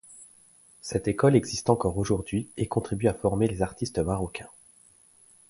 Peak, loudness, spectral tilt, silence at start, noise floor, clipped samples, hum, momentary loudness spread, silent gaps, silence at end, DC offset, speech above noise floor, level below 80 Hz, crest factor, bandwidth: -6 dBFS; -27 LUFS; -6.5 dB/octave; 0.1 s; -58 dBFS; under 0.1%; none; 18 LU; none; 1.05 s; under 0.1%; 32 dB; -46 dBFS; 22 dB; 11.5 kHz